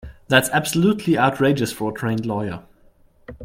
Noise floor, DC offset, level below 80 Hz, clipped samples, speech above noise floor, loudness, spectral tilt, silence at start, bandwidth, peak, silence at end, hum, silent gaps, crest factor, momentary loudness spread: -54 dBFS; under 0.1%; -50 dBFS; under 0.1%; 34 dB; -20 LUFS; -5 dB/octave; 0.05 s; 16.5 kHz; -2 dBFS; 0 s; none; none; 20 dB; 9 LU